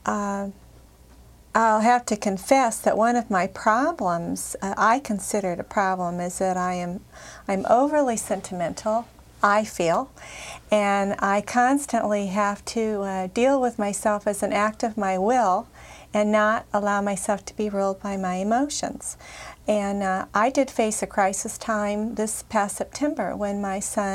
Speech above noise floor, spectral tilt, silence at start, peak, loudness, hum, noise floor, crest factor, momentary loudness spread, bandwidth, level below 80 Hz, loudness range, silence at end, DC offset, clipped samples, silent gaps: 26 dB; -4.5 dB/octave; 0.05 s; -6 dBFS; -24 LUFS; none; -50 dBFS; 18 dB; 8 LU; 16 kHz; -54 dBFS; 3 LU; 0 s; under 0.1%; under 0.1%; none